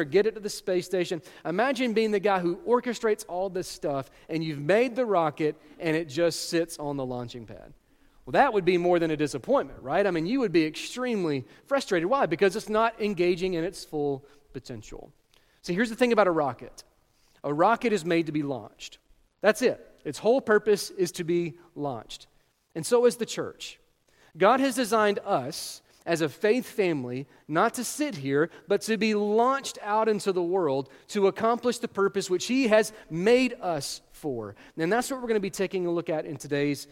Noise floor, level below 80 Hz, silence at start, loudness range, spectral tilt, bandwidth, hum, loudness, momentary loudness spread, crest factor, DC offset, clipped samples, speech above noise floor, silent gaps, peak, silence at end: -64 dBFS; -60 dBFS; 0 s; 3 LU; -5 dB/octave; 16.5 kHz; none; -27 LUFS; 13 LU; 22 dB; under 0.1%; under 0.1%; 37 dB; none; -6 dBFS; 0.1 s